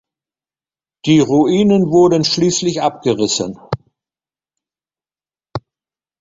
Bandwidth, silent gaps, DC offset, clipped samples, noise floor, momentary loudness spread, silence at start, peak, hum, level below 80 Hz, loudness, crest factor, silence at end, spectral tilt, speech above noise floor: 7.8 kHz; none; under 0.1%; under 0.1%; under -90 dBFS; 17 LU; 1.05 s; -2 dBFS; none; -52 dBFS; -14 LUFS; 16 dB; 0.6 s; -5 dB/octave; over 77 dB